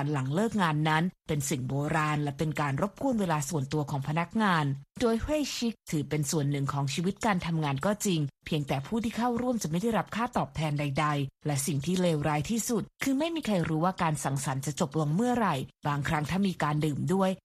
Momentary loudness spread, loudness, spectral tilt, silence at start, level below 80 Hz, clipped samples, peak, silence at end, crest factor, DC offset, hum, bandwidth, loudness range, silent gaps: 4 LU; -29 LUFS; -5.5 dB/octave; 0 s; -54 dBFS; under 0.1%; -12 dBFS; 0.05 s; 16 dB; under 0.1%; none; 15 kHz; 1 LU; none